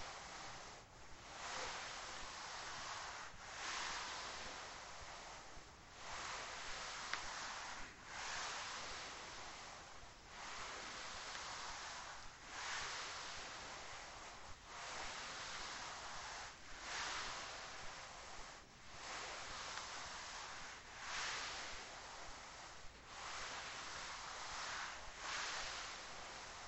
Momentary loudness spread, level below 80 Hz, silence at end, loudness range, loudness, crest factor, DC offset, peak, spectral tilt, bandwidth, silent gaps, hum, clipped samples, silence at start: 10 LU; -66 dBFS; 0 s; 2 LU; -48 LUFS; 26 dB; under 0.1%; -24 dBFS; -0.5 dB/octave; 16 kHz; none; none; under 0.1%; 0 s